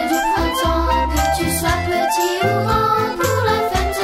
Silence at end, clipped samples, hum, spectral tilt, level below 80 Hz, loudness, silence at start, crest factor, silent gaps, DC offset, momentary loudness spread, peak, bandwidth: 0 s; under 0.1%; none; -4.5 dB/octave; -28 dBFS; -17 LUFS; 0 s; 14 dB; none; under 0.1%; 2 LU; -4 dBFS; 16 kHz